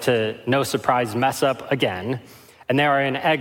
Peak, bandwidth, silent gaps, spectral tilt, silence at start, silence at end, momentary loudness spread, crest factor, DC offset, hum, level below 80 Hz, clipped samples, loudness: -4 dBFS; 17 kHz; none; -5 dB/octave; 0 s; 0 s; 9 LU; 18 dB; under 0.1%; none; -64 dBFS; under 0.1%; -21 LUFS